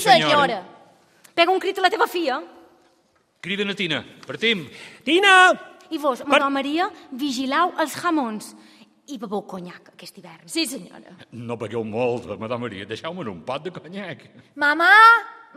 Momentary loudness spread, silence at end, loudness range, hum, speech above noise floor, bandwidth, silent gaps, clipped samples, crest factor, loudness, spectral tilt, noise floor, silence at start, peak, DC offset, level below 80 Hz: 23 LU; 0.2 s; 11 LU; none; 42 dB; 15.5 kHz; none; under 0.1%; 20 dB; -20 LUFS; -3.5 dB/octave; -63 dBFS; 0 s; -2 dBFS; under 0.1%; -70 dBFS